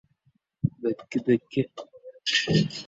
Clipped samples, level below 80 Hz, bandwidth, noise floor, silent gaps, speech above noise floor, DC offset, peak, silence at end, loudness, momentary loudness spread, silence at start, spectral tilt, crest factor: under 0.1%; -56 dBFS; 8 kHz; -69 dBFS; none; 43 dB; under 0.1%; -10 dBFS; 0 s; -27 LUFS; 12 LU; 0.65 s; -5 dB/octave; 18 dB